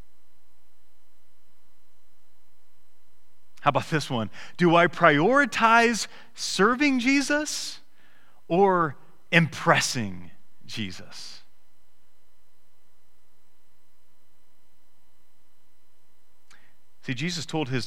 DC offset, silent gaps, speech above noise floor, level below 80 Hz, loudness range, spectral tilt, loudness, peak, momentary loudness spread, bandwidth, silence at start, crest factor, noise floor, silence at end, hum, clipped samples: 1%; none; 45 dB; -60 dBFS; 17 LU; -4.5 dB/octave; -23 LUFS; -2 dBFS; 17 LU; 16.5 kHz; 0 s; 26 dB; -69 dBFS; 0 s; none; under 0.1%